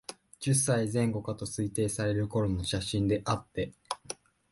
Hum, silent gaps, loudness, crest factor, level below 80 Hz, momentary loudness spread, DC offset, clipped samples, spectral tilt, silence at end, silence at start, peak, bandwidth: none; none; -31 LUFS; 18 dB; -50 dBFS; 11 LU; under 0.1%; under 0.1%; -5 dB/octave; 0.35 s; 0.1 s; -14 dBFS; 12 kHz